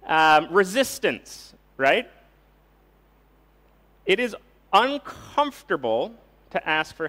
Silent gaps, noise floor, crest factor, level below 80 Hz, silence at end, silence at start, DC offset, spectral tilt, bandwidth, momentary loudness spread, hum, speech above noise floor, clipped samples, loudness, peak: none; -58 dBFS; 18 dB; -60 dBFS; 0 s; 0.05 s; under 0.1%; -3.5 dB/octave; 16 kHz; 16 LU; none; 36 dB; under 0.1%; -23 LUFS; -6 dBFS